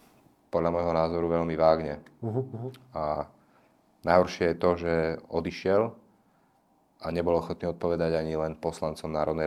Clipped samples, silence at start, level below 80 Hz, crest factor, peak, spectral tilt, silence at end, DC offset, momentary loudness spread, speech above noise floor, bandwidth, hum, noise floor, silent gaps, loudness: under 0.1%; 0.55 s; -56 dBFS; 22 dB; -6 dBFS; -7 dB/octave; 0 s; under 0.1%; 11 LU; 39 dB; 13 kHz; none; -66 dBFS; none; -28 LUFS